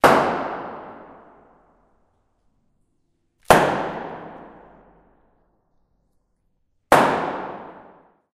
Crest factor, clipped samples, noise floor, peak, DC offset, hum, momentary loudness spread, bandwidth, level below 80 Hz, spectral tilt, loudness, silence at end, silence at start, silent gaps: 24 dB; under 0.1%; -68 dBFS; 0 dBFS; under 0.1%; none; 25 LU; 15.5 kHz; -52 dBFS; -4.5 dB/octave; -20 LUFS; 0.55 s; 0.05 s; none